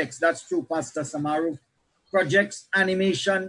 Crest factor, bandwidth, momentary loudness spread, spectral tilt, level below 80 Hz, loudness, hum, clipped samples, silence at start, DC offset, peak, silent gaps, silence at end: 18 dB; 11 kHz; 8 LU; -4.5 dB/octave; -70 dBFS; -25 LUFS; none; under 0.1%; 0 s; under 0.1%; -8 dBFS; none; 0 s